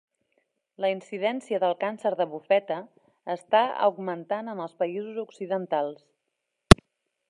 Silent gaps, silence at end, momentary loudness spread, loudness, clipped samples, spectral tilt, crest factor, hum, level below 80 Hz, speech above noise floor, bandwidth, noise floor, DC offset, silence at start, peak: none; 0.55 s; 16 LU; -26 LUFS; under 0.1%; -5.5 dB/octave; 26 dB; none; -38 dBFS; 54 dB; 13 kHz; -81 dBFS; under 0.1%; 0.8 s; 0 dBFS